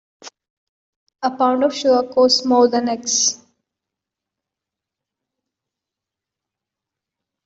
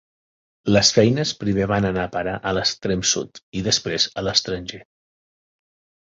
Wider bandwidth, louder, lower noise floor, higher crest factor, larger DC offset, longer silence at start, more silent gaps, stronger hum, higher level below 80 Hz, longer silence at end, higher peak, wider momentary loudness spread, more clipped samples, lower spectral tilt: about the same, 8 kHz vs 7.8 kHz; first, -17 LUFS vs -20 LUFS; second, -86 dBFS vs under -90 dBFS; about the same, 18 dB vs 20 dB; neither; second, 0.25 s vs 0.65 s; first, 0.50-1.06 s vs 3.43-3.52 s; neither; second, -66 dBFS vs -46 dBFS; first, 4.1 s vs 1.25 s; about the same, -2 dBFS vs -2 dBFS; second, 9 LU vs 13 LU; neither; second, -1.5 dB/octave vs -3.5 dB/octave